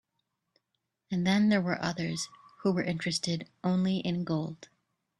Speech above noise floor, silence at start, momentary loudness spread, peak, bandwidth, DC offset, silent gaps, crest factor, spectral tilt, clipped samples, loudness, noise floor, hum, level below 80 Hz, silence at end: 53 dB; 1.1 s; 11 LU; -14 dBFS; 11.5 kHz; under 0.1%; none; 18 dB; -5.5 dB/octave; under 0.1%; -30 LUFS; -83 dBFS; none; -68 dBFS; 0.55 s